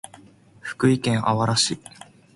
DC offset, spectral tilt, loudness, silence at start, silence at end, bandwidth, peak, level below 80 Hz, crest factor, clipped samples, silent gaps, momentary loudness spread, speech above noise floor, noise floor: under 0.1%; -4.5 dB/octave; -21 LUFS; 0.65 s; 0.6 s; 11.5 kHz; -6 dBFS; -56 dBFS; 18 dB; under 0.1%; none; 17 LU; 29 dB; -50 dBFS